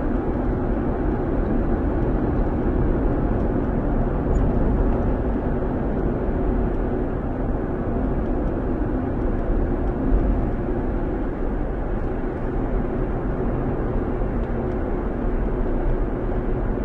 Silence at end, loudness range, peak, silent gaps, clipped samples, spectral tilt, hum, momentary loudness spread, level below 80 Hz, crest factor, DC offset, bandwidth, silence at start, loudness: 0 s; 3 LU; -8 dBFS; none; under 0.1%; -11 dB/octave; none; 4 LU; -24 dBFS; 14 dB; under 0.1%; 3.6 kHz; 0 s; -24 LUFS